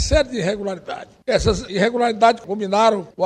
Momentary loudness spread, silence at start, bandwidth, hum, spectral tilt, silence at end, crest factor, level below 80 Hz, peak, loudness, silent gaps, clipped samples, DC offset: 12 LU; 0 s; 10.5 kHz; none; -4.5 dB/octave; 0 s; 16 dB; -32 dBFS; -2 dBFS; -19 LUFS; none; under 0.1%; under 0.1%